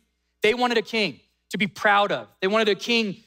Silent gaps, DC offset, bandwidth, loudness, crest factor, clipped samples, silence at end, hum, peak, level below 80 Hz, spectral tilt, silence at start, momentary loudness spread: none; under 0.1%; 16 kHz; -22 LUFS; 16 dB; under 0.1%; 0.1 s; none; -6 dBFS; -66 dBFS; -4 dB/octave; 0.45 s; 7 LU